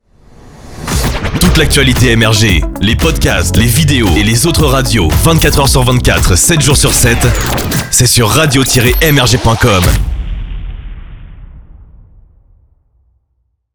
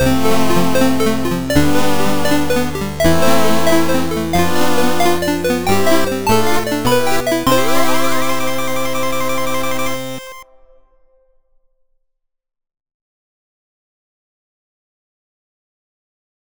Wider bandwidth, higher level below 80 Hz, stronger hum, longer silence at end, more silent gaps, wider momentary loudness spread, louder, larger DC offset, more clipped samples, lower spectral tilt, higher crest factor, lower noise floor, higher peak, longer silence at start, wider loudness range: about the same, over 20 kHz vs over 20 kHz; first, -18 dBFS vs -36 dBFS; neither; second, 2 s vs 3.55 s; neither; about the same, 8 LU vs 6 LU; first, -9 LUFS vs -16 LUFS; second, under 0.1% vs 10%; neither; about the same, -4 dB/octave vs -4.5 dB/octave; second, 10 dB vs 16 dB; second, -62 dBFS vs -70 dBFS; about the same, 0 dBFS vs -2 dBFS; first, 0.45 s vs 0 s; second, 6 LU vs 9 LU